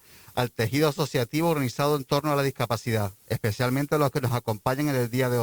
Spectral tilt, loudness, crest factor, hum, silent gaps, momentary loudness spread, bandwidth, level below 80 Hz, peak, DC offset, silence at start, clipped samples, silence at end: -6 dB/octave; -26 LUFS; 16 dB; none; none; 5 LU; over 20 kHz; -56 dBFS; -8 dBFS; under 0.1%; 0.35 s; under 0.1%; 0 s